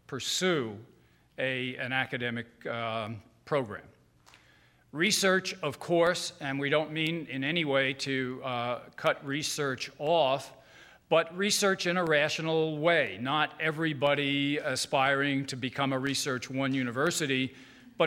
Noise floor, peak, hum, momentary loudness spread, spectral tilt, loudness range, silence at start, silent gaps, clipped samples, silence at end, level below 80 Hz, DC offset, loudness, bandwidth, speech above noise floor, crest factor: -62 dBFS; -10 dBFS; none; 8 LU; -3.5 dB/octave; 6 LU; 0.1 s; none; under 0.1%; 0 s; -70 dBFS; under 0.1%; -29 LUFS; 16 kHz; 33 dB; 20 dB